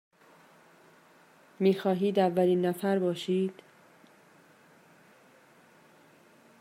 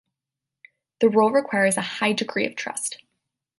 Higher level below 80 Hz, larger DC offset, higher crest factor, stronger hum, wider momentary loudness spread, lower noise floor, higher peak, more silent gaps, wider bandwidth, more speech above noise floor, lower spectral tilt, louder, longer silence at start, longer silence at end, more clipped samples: second, -82 dBFS vs -72 dBFS; neither; about the same, 20 dB vs 18 dB; neither; second, 5 LU vs 10 LU; second, -59 dBFS vs -87 dBFS; second, -12 dBFS vs -6 dBFS; neither; first, 16 kHz vs 12 kHz; second, 32 dB vs 65 dB; first, -7 dB/octave vs -3.5 dB/octave; second, -28 LUFS vs -22 LUFS; first, 1.6 s vs 1 s; first, 3.1 s vs 0.65 s; neither